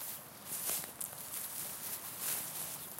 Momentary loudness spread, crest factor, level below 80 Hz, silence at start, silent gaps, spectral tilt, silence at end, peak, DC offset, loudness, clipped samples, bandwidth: 6 LU; 24 dB; -76 dBFS; 0 s; none; -0.5 dB/octave; 0 s; -18 dBFS; under 0.1%; -39 LUFS; under 0.1%; 17 kHz